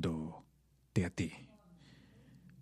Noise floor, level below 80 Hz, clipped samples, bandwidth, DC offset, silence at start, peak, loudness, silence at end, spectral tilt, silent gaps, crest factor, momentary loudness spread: -70 dBFS; -62 dBFS; under 0.1%; 13 kHz; under 0.1%; 0 s; -18 dBFS; -40 LUFS; 0 s; -6.5 dB/octave; none; 22 dB; 24 LU